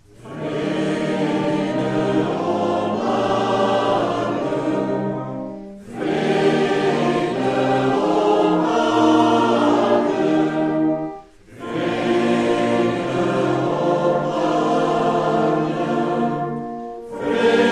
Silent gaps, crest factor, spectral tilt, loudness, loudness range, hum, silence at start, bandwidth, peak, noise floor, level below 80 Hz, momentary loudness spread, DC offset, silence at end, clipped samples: none; 16 dB; -6.5 dB/octave; -19 LUFS; 4 LU; none; 0.2 s; 10.5 kHz; -4 dBFS; -39 dBFS; -54 dBFS; 11 LU; under 0.1%; 0 s; under 0.1%